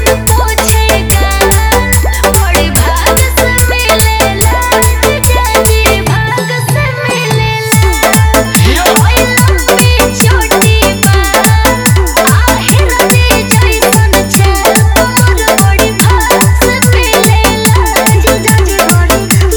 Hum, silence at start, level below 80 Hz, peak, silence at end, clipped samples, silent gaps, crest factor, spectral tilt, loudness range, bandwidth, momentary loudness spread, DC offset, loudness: none; 0 s; -14 dBFS; 0 dBFS; 0 s; 2%; none; 8 dB; -4 dB/octave; 2 LU; over 20 kHz; 2 LU; under 0.1%; -7 LUFS